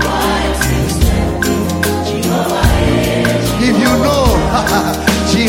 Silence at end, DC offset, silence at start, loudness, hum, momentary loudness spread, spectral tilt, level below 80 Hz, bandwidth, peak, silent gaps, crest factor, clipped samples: 0 s; 0.1%; 0 s; -13 LUFS; none; 4 LU; -5 dB/octave; -22 dBFS; 16.5 kHz; 0 dBFS; none; 12 dB; under 0.1%